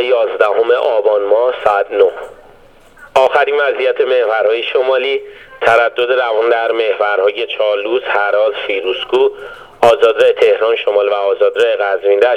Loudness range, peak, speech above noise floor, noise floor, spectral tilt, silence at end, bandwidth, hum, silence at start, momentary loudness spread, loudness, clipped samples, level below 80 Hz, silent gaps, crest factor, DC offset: 2 LU; 0 dBFS; 30 dB; -42 dBFS; -3.5 dB/octave; 0 s; 10.5 kHz; none; 0 s; 6 LU; -13 LUFS; under 0.1%; -54 dBFS; none; 14 dB; under 0.1%